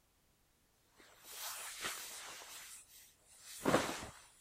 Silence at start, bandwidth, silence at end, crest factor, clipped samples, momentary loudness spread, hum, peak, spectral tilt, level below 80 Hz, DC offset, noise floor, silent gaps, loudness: 1 s; 16 kHz; 0 s; 30 dB; under 0.1%; 23 LU; none; -14 dBFS; -3 dB/octave; -70 dBFS; under 0.1%; -74 dBFS; none; -42 LUFS